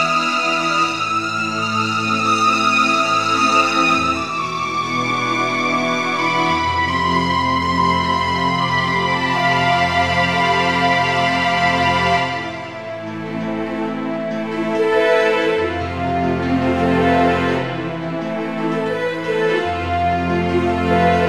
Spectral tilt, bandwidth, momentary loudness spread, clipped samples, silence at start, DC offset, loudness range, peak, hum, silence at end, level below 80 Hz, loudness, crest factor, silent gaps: -5 dB/octave; 14.5 kHz; 8 LU; under 0.1%; 0 s; 0.4%; 4 LU; -2 dBFS; none; 0 s; -44 dBFS; -17 LUFS; 14 dB; none